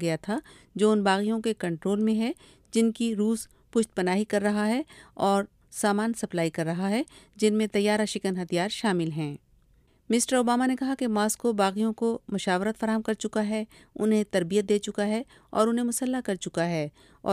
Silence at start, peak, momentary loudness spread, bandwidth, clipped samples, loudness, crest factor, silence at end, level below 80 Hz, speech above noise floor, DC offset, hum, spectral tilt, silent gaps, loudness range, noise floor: 0 s; -8 dBFS; 8 LU; 15.5 kHz; under 0.1%; -27 LUFS; 18 dB; 0 s; -64 dBFS; 36 dB; under 0.1%; none; -5 dB/octave; none; 1 LU; -62 dBFS